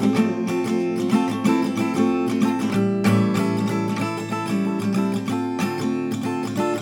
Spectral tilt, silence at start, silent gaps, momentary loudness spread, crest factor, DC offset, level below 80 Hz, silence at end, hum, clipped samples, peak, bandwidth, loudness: -6.5 dB/octave; 0 s; none; 5 LU; 14 dB; under 0.1%; -68 dBFS; 0 s; none; under 0.1%; -6 dBFS; 17.5 kHz; -22 LUFS